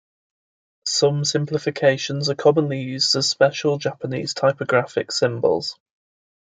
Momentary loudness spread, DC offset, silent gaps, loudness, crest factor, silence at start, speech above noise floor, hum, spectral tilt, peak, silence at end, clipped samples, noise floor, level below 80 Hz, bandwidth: 7 LU; under 0.1%; none; -20 LUFS; 20 dB; 0.85 s; over 70 dB; none; -4 dB/octave; -2 dBFS; 0.7 s; under 0.1%; under -90 dBFS; -68 dBFS; 9.4 kHz